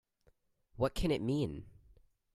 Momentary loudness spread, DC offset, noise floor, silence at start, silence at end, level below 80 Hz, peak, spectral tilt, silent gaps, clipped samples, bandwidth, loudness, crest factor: 7 LU; under 0.1%; -72 dBFS; 0.75 s; 0.65 s; -50 dBFS; -18 dBFS; -7 dB/octave; none; under 0.1%; 15 kHz; -35 LUFS; 20 dB